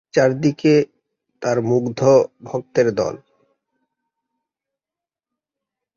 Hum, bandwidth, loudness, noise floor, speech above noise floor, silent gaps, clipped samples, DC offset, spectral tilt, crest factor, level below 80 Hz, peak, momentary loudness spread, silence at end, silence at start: none; 7.4 kHz; -18 LUFS; -89 dBFS; 72 dB; none; under 0.1%; under 0.1%; -6.5 dB/octave; 18 dB; -60 dBFS; -2 dBFS; 12 LU; 2.8 s; 0.15 s